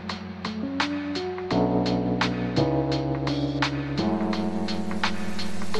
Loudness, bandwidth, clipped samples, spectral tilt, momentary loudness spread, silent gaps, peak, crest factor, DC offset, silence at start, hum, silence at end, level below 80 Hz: -27 LUFS; 12.5 kHz; under 0.1%; -6 dB/octave; 8 LU; none; -8 dBFS; 16 dB; under 0.1%; 0 s; none; 0 s; -46 dBFS